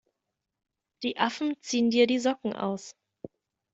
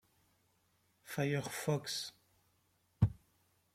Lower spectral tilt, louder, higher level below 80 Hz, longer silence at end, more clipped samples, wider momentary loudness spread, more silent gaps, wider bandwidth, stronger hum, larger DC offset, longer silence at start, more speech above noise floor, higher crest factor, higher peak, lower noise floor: about the same, -4 dB/octave vs -5 dB/octave; first, -28 LUFS vs -38 LUFS; second, -74 dBFS vs -58 dBFS; second, 0.45 s vs 0.6 s; neither; first, 24 LU vs 7 LU; neither; second, 8 kHz vs 16 kHz; neither; neither; about the same, 1 s vs 1.05 s; first, 58 dB vs 38 dB; about the same, 22 dB vs 24 dB; first, -8 dBFS vs -16 dBFS; first, -85 dBFS vs -76 dBFS